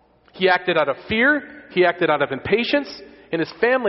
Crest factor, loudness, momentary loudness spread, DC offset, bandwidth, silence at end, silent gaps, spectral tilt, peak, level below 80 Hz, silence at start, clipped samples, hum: 16 dB; -20 LUFS; 9 LU; under 0.1%; 6 kHz; 0 s; none; -2.5 dB/octave; -4 dBFS; -54 dBFS; 0.35 s; under 0.1%; none